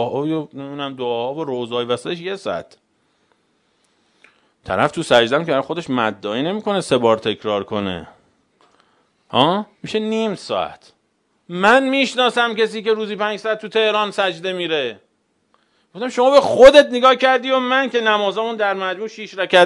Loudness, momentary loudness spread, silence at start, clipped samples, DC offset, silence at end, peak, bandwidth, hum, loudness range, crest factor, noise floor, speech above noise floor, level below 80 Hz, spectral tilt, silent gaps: -18 LUFS; 12 LU; 0 s; 0.1%; under 0.1%; 0 s; 0 dBFS; 11 kHz; none; 12 LU; 18 dB; -66 dBFS; 48 dB; -54 dBFS; -4.5 dB/octave; none